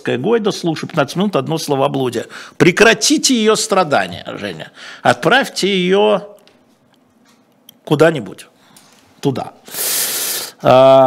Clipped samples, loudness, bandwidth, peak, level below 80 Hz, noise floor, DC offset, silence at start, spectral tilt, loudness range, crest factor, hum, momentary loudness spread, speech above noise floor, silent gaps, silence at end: under 0.1%; -14 LUFS; 16.5 kHz; 0 dBFS; -54 dBFS; -53 dBFS; under 0.1%; 0.05 s; -4 dB/octave; 7 LU; 16 dB; none; 16 LU; 39 dB; none; 0 s